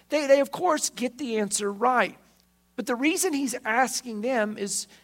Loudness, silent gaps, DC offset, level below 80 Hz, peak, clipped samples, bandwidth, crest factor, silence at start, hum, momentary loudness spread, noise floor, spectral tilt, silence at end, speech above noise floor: -25 LUFS; none; under 0.1%; -72 dBFS; -6 dBFS; under 0.1%; 16.5 kHz; 20 dB; 0.1 s; none; 8 LU; -63 dBFS; -2.5 dB/octave; 0.2 s; 38 dB